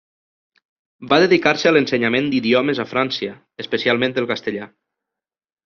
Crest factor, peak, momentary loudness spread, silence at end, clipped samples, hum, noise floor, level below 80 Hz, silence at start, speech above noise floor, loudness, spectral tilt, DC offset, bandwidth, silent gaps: 18 dB; -2 dBFS; 13 LU; 1 s; under 0.1%; none; -86 dBFS; -62 dBFS; 1 s; 68 dB; -18 LUFS; -3 dB/octave; under 0.1%; 7 kHz; none